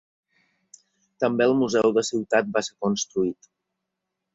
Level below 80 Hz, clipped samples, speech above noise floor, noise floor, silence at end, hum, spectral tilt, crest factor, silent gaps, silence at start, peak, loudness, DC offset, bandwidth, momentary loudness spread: -66 dBFS; under 0.1%; 59 dB; -82 dBFS; 1 s; none; -4.5 dB/octave; 20 dB; none; 1.2 s; -6 dBFS; -23 LUFS; under 0.1%; 8.2 kHz; 7 LU